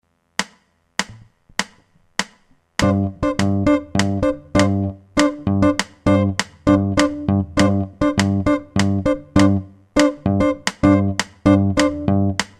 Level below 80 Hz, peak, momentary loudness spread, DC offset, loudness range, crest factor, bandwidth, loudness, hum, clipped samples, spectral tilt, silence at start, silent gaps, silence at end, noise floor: -38 dBFS; 0 dBFS; 10 LU; under 0.1%; 4 LU; 18 dB; 12 kHz; -19 LUFS; none; under 0.1%; -5.5 dB/octave; 0.4 s; none; 0.15 s; -58 dBFS